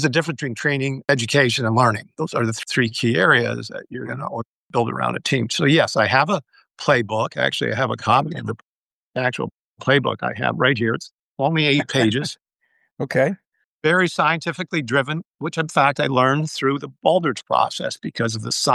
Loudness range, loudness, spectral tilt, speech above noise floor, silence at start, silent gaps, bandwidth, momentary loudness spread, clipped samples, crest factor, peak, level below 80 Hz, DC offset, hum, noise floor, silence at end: 3 LU; -20 LUFS; -5 dB/octave; 47 dB; 0 s; 4.46-4.69 s, 8.63-9.12 s, 9.54-9.76 s, 11.14-11.35 s, 12.93-12.97 s, 13.47-13.51 s, 13.64-13.80 s, 15.27-15.31 s; 12.5 kHz; 12 LU; under 0.1%; 20 dB; -2 dBFS; -62 dBFS; under 0.1%; none; -67 dBFS; 0 s